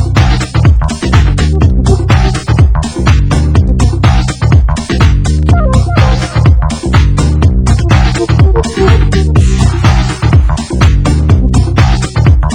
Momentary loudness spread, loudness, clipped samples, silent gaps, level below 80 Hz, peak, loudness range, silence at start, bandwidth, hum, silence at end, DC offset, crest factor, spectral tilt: 2 LU; -9 LUFS; 3%; none; -10 dBFS; 0 dBFS; 1 LU; 0 s; 10 kHz; none; 0 s; 0.6%; 8 dB; -6.5 dB/octave